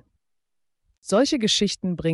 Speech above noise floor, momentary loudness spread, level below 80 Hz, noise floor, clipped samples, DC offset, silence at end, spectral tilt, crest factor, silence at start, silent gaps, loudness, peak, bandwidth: 52 dB; 6 LU; -54 dBFS; -74 dBFS; under 0.1%; under 0.1%; 0 s; -4 dB/octave; 16 dB; 1.05 s; none; -22 LUFS; -10 dBFS; 11.5 kHz